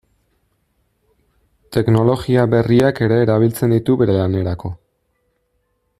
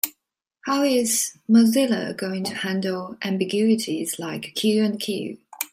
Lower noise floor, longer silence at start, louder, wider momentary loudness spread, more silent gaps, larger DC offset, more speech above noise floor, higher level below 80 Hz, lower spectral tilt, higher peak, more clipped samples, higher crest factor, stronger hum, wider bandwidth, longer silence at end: second, -67 dBFS vs -78 dBFS; first, 1.7 s vs 0.05 s; first, -16 LUFS vs -22 LUFS; about the same, 9 LU vs 11 LU; neither; neither; second, 52 dB vs 56 dB; first, -46 dBFS vs -70 dBFS; first, -8 dB/octave vs -4 dB/octave; about the same, -2 dBFS vs 0 dBFS; neither; second, 16 dB vs 22 dB; neither; second, 14.5 kHz vs 16 kHz; first, 1.25 s vs 0.05 s